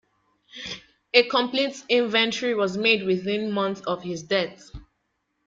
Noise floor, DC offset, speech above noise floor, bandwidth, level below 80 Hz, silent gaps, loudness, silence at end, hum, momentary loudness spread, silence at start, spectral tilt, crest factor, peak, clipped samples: -75 dBFS; under 0.1%; 51 dB; 7.8 kHz; -58 dBFS; none; -23 LUFS; 0.65 s; none; 15 LU; 0.55 s; -4 dB/octave; 22 dB; -4 dBFS; under 0.1%